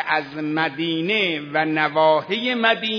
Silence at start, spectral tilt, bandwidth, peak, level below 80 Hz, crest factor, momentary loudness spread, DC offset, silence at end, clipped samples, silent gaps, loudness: 0 s; -6 dB/octave; 5.4 kHz; -2 dBFS; -68 dBFS; 18 dB; 5 LU; under 0.1%; 0 s; under 0.1%; none; -20 LUFS